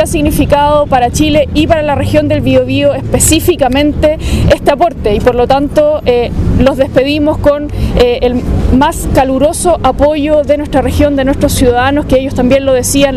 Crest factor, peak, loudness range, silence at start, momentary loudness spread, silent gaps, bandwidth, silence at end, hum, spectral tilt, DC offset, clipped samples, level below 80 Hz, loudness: 8 dB; 0 dBFS; 1 LU; 0 s; 3 LU; none; 16 kHz; 0 s; none; -5 dB/octave; under 0.1%; 0.4%; -20 dBFS; -10 LUFS